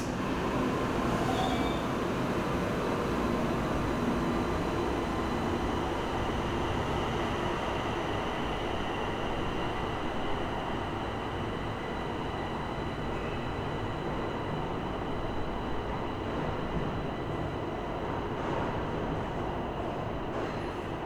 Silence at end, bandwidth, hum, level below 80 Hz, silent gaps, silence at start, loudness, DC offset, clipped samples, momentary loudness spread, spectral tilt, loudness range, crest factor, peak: 0 s; over 20 kHz; none; -42 dBFS; none; 0 s; -33 LUFS; under 0.1%; under 0.1%; 5 LU; -6 dB/octave; 4 LU; 16 dB; -16 dBFS